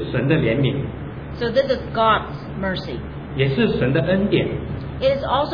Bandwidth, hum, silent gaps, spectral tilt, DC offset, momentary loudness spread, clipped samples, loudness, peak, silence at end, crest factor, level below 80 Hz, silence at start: 5.4 kHz; none; none; -8.5 dB/octave; under 0.1%; 12 LU; under 0.1%; -21 LUFS; -6 dBFS; 0 s; 14 dB; -38 dBFS; 0 s